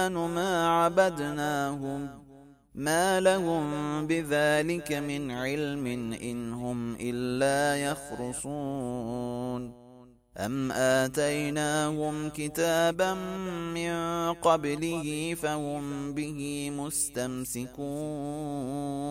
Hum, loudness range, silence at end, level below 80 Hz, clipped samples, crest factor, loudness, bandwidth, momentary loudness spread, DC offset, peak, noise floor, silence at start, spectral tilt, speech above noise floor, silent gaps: none; 5 LU; 0 s; -56 dBFS; under 0.1%; 20 dB; -29 LUFS; 16 kHz; 10 LU; under 0.1%; -10 dBFS; -54 dBFS; 0 s; -4.5 dB/octave; 25 dB; none